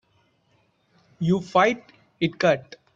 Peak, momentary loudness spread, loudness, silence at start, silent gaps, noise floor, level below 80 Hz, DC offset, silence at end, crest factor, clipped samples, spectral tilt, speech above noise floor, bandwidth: -6 dBFS; 8 LU; -23 LUFS; 1.2 s; none; -66 dBFS; -64 dBFS; under 0.1%; 0.35 s; 20 dB; under 0.1%; -6 dB/octave; 44 dB; 7.6 kHz